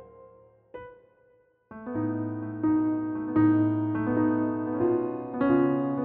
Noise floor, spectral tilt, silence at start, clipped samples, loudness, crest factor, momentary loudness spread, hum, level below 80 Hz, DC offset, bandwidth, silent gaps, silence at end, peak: -63 dBFS; -9 dB/octave; 0 s; under 0.1%; -27 LUFS; 16 dB; 16 LU; none; -62 dBFS; under 0.1%; 3.3 kHz; none; 0 s; -12 dBFS